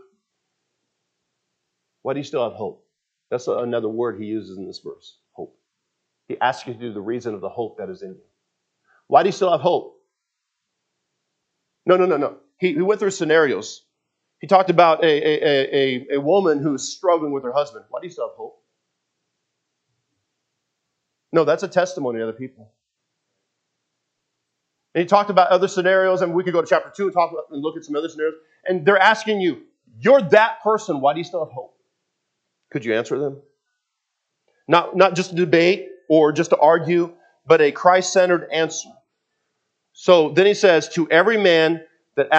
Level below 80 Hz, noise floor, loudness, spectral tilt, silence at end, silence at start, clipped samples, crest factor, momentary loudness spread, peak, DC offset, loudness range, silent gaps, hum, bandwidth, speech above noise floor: -78 dBFS; -80 dBFS; -19 LUFS; -4.5 dB/octave; 0 s; 2.05 s; under 0.1%; 20 dB; 16 LU; 0 dBFS; under 0.1%; 11 LU; none; none; 8.4 kHz; 61 dB